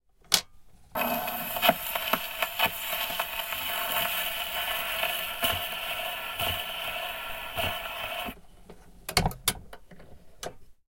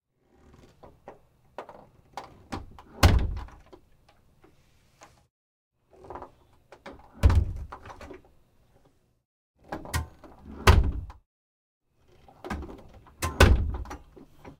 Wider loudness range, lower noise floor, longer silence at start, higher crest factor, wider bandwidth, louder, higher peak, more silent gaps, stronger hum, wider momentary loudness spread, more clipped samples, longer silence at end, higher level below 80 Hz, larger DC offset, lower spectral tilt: second, 5 LU vs 8 LU; second, -51 dBFS vs -64 dBFS; second, 0.3 s vs 1.05 s; about the same, 30 dB vs 30 dB; about the same, 16.5 kHz vs 16.5 kHz; second, -29 LUFS vs -26 LUFS; about the same, -2 dBFS vs 0 dBFS; second, none vs 5.30-5.71 s, 9.25-9.54 s, 11.26-11.81 s; neither; second, 9 LU vs 27 LU; neither; about the same, 0.15 s vs 0.1 s; second, -50 dBFS vs -34 dBFS; neither; second, -2 dB/octave vs -5.5 dB/octave